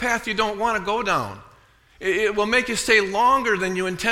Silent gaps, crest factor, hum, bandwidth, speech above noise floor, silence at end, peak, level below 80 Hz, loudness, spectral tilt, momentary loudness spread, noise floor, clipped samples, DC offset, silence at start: none; 18 dB; none; 16.5 kHz; 33 dB; 0 s; -4 dBFS; -48 dBFS; -21 LUFS; -3 dB/octave; 7 LU; -54 dBFS; under 0.1%; under 0.1%; 0 s